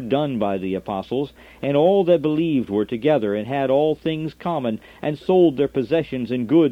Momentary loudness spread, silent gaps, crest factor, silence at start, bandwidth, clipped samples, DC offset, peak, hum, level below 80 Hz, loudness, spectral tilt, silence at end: 10 LU; none; 16 dB; 0 s; 6.4 kHz; under 0.1%; under 0.1%; -4 dBFS; none; -54 dBFS; -21 LUFS; -8.5 dB/octave; 0 s